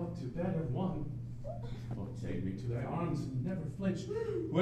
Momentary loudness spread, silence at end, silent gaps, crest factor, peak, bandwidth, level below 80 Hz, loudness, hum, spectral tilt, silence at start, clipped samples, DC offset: 7 LU; 0 s; none; 20 dB; -18 dBFS; 9.2 kHz; -52 dBFS; -38 LUFS; none; -8.5 dB/octave; 0 s; under 0.1%; under 0.1%